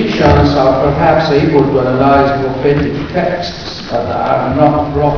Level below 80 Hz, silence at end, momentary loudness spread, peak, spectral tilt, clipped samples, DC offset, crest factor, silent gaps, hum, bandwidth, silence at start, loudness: -28 dBFS; 0 s; 8 LU; 0 dBFS; -7.5 dB/octave; 0.3%; 0.5%; 12 dB; none; none; 5.4 kHz; 0 s; -12 LUFS